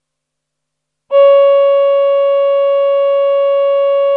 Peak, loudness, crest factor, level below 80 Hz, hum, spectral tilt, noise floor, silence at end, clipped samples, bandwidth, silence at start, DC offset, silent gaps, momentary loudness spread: 0 dBFS; -11 LUFS; 10 dB; -86 dBFS; none; -1 dB/octave; -76 dBFS; 0 s; under 0.1%; 4.1 kHz; 1.1 s; under 0.1%; none; 4 LU